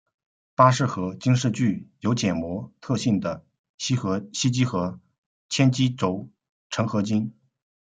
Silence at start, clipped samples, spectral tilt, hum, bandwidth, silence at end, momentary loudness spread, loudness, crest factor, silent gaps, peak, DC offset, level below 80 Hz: 0.6 s; under 0.1%; -5.5 dB/octave; none; 9.2 kHz; 0.55 s; 13 LU; -24 LUFS; 22 dB; 3.59-3.78 s, 5.18-5.49 s, 6.49-6.70 s; -2 dBFS; under 0.1%; -62 dBFS